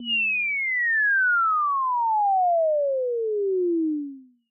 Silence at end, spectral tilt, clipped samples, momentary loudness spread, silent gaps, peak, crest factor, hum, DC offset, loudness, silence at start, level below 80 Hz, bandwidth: 0.3 s; 6.5 dB/octave; under 0.1%; 6 LU; none; -16 dBFS; 6 dB; none; under 0.1%; -22 LUFS; 0 s; under -90 dBFS; 3.2 kHz